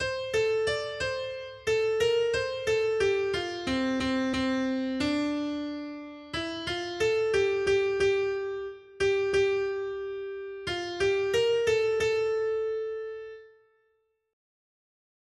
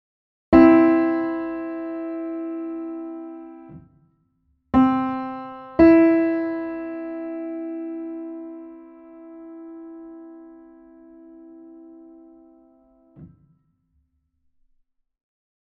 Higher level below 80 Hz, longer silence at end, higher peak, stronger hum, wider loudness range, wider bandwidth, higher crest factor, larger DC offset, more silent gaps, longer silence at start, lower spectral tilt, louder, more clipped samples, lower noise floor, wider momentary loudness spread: second, -56 dBFS vs -50 dBFS; second, 1.85 s vs 2.5 s; second, -14 dBFS vs -2 dBFS; neither; second, 3 LU vs 23 LU; first, 12.5 kHz vs 4.7 kHz; second, 14 dB vs 22 dB; neither; neither; second, 0 s vs 0.5 s; second, -4.5 dB/octave vs -9.5 dB/octave; second, -28 LUFS vs -20 LUFS; neither; first, -73 dBFS vs -69 dBFS; second, 11 LU vs 27 LU